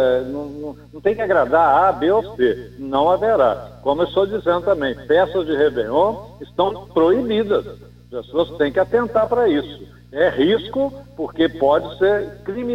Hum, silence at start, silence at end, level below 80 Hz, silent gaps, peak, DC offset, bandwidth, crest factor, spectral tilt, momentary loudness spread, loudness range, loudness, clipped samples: 60 Hz at -40 dBFS; 0 s; 0 s; -46 dBFS; none; -4 dBFS; under 0.1%; 9 kHz; 16 dB; -7 dB/octave; 13 LU; 3 LU; -19 LUFS; under 0.1%